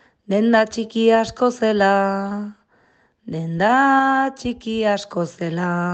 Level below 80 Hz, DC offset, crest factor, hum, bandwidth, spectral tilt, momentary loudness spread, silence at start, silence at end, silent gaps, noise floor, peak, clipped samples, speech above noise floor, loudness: -56 dBFS; under 0.1%; 16 dB; none; 8.6 kHz; -6 dB/octave; 12 LU; 0.3 s; 0 s; none; -59 dBFS; -4 dBFS; under 0.1%; 41 dB; -19 LUFS